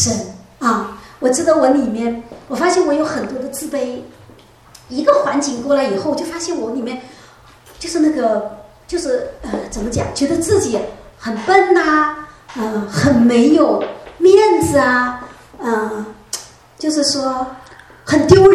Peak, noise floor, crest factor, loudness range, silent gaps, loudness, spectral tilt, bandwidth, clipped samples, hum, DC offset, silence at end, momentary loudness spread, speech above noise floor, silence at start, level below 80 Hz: 0 dBFS; -44 dBFS; 16 dB; 7 LU; none; -16 LUFS; -4.5 dB/octave; 14 kHz; under 0.1%; none; under 0.1%; 0 s; 16 LU; 29 dB; 0 s; -44 dBFS